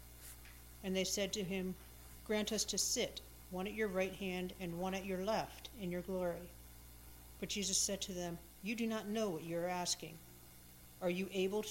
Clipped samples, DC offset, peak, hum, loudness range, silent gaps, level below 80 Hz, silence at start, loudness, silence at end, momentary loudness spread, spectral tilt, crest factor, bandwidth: under 0.1%; under 0.1%; -22 dBFS; 60 Hz at -60 dBFS; 3 LU; none; -60 dBFS; 0 s; -40 LUFS; 0 s; 20 LU; -3 dB/octave; 20 dB; 16 kHz